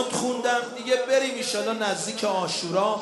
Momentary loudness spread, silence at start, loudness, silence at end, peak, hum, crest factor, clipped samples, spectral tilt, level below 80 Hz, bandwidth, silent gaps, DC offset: 4 LU; 0 s; -25 LUFS; 0 s; -10 dBFS; none; 16 dB; under 0.1%; -2.5 dB/octave; -72 dBFS; 11.5 kHz; none; under 0.1%